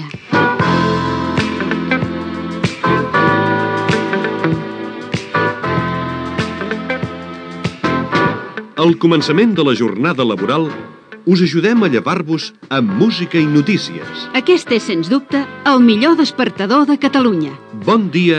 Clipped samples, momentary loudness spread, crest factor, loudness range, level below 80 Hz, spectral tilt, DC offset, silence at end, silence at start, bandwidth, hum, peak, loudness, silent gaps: under 0.1%; 10 LU; 14 dB; 5 LU; -48 dBFS; -6.5 dB/octave; under 0.1%; 0 s; 0 s; 9.8 kHz; none; 0 dBFS; -15 LUFS; none